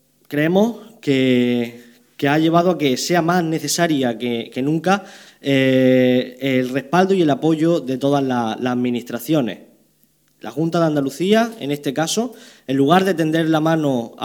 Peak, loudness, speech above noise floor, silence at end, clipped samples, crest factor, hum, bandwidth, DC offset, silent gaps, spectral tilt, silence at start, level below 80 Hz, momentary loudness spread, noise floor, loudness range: 0 dBFS; -18 LUFS; 42 dB; 0 s; under 0.1%; 18 dB; none; 19 kHz; under 0.1%; none; -5.5 dB/octave; 0.3 s; -68 dBFS; 9 LU; -60 dBFS; 4 LU